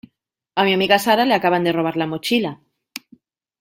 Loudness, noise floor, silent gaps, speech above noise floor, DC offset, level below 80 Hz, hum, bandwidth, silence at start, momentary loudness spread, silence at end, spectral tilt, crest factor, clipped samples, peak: -18 LUFS; -68 dBFS; none; 50 dB; under 0.1%; -62 dBFS; none; 16.5 kHz; 0.55 s; 21 LU; 0.6 s; -4.5 dB/octave; 18 dB; under 0.1%; -2 dBFS